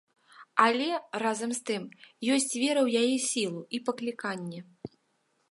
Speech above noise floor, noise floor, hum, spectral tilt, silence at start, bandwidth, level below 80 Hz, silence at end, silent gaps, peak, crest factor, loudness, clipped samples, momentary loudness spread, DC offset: 44 dB; -74 dBFS; none; -3 dB/octave; 0.4 s; 11.5 kHz; -80 dBFS; 0.65 s; none; -6 dBFS; 24 dB; -29 LUFS; under 0.1%; 17 LU; under 0.1%